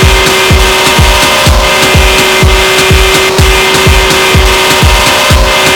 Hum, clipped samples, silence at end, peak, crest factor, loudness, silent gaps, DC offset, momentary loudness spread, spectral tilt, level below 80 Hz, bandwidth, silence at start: none; 0.9%; 0 s; 0 dBFS; 6 dB; -5 LUFS; none; under 0.1%; 1 LU; -3 dB/octave; -12 dBFS; 18 kHz; 0 s